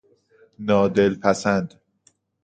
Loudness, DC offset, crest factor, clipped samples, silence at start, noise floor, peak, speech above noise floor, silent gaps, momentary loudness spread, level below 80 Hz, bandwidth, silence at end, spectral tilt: -21 LUFS; under 0.1%; 20 dB; under 0.1%; 0.6 s; -63 dBFS; -2 dBFS; 43 dB; none; 11 LU; -54 dBFS; 9.2 kHz; 0.75 s; -6 dB/octave